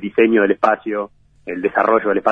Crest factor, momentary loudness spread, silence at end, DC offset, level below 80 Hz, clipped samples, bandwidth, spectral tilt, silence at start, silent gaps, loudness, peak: 16 dB; 16 LU; 0 s; under 0.1%; -58 dBFS; under 0.1%; 6.4 kHz; -7.5 dB/octave; 0 s; none; -17 LUFS; 0 dBFS